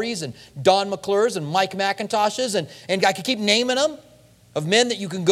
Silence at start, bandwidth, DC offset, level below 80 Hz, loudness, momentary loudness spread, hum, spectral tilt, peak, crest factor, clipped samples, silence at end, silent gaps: 0 s; 15.5 kHz; under 0.1%; -64 dBFS; -21 LUFS; 8 LU; none; -3.5 dB/octave; -2 dBFS; 20 dB; under 0.1%; 0 s; none